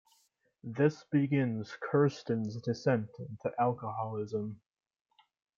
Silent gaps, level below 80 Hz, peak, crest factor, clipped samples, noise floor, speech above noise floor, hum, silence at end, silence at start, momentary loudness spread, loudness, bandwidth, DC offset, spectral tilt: none; -76 dBFS; -14 dBFS; 18 dB; under 0.1%; -73 dBFS; 41 dB; none; 1 s; 0.65 s; 13 LU; -33 LUFS; 7.4 kHz; under 0.1%; -8 dB/octave